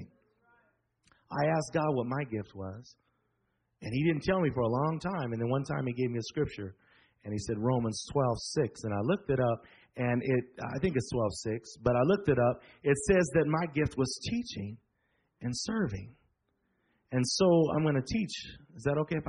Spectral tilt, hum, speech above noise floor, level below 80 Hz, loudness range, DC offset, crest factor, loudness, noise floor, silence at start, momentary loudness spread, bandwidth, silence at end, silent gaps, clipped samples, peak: -6 dB/octave; none; 48 dB; -56 dBFS; 6 LU; under 0.1%; 20 dB; -31 LUFS; -78 dBFS; 0 s; 13 LU; 10 kHz; 0 s; none; under 0.1%; -12 dBFS